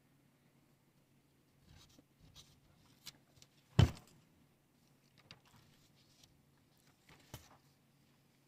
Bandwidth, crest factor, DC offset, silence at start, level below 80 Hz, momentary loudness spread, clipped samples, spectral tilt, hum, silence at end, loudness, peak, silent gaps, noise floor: 15.5 kHz; 34 dB; under 0.1%; 3.8 s; -56 dBFS; 30 LU; under 0.1%; -6.5 dB/octave; none; 1.1 s; -34 LUFS; -12 dBFS; none; -72 dBFS